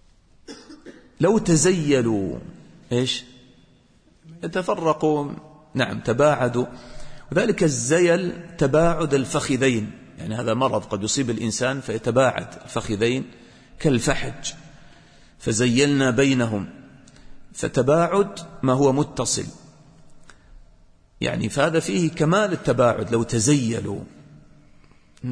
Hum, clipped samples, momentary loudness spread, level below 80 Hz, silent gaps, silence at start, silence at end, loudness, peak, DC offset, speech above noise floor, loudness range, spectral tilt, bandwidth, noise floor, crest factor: none; under 0.1%; 14 LU; -46 dBFS; none; 0.5 s; 0 s; -22 LUFS; -6 dBFS; under 0.1%; 35 dB; 5 LU; -5 dB/octave; 11 kHz; -56 dBFS; 18 dB